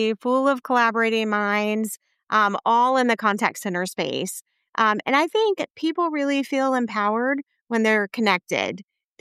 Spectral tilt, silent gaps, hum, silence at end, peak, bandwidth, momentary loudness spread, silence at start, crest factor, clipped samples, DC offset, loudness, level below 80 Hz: -4 dB/octave; 4.69-4.73 s, 5.70-5.74 s, 7.61-7.67 s; none; 0.4 s; -6 dBFS; 15 kHz; 8 LU; 0 s; 18 dB; under 0.1%; under 0.1%; -22 LUFS; -82 dBFS